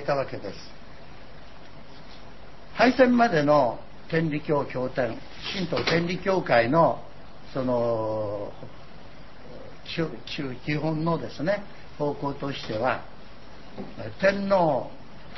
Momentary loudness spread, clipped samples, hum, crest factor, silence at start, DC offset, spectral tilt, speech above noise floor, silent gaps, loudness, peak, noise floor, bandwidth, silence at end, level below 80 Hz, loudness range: 25 LU; under 0.1%; none; 20 dB; 0 s; 1%; -6.5 dB/octave; 22 dB; none; -25 LUFS; -6 dBFS; -47 dBFS; 6.2 kHz; 0 s; -52 dBFS; 8 LU